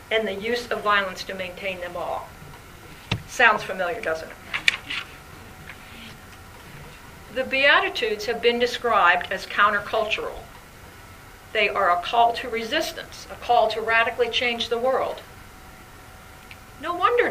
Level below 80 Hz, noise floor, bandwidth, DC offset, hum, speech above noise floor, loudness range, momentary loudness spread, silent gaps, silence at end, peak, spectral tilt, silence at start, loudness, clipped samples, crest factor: -50 dBFS; -44 dBFS; 15.5 kHz; under 0.1%; none; 22 dB; 7 LU; 25 LU; none; 0 s; 0 dBFS; -3 dB/octave; 0 s; -22 LUFS; under 0.1%; 24 dB